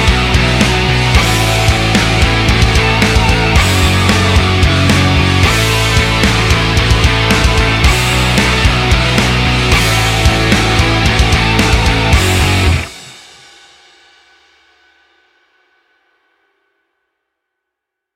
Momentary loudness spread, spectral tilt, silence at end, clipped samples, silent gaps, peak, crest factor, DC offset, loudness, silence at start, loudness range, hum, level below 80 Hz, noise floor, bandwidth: 1 LU; -4.5 dB/octave; 5 s; under 0.1%; none; 0 dBFS; 12 dB; under 0.1%; -10 LUFS; 0 s; 4 LU; none; -18 dBFS; -78 dBFS; 16.5 kHz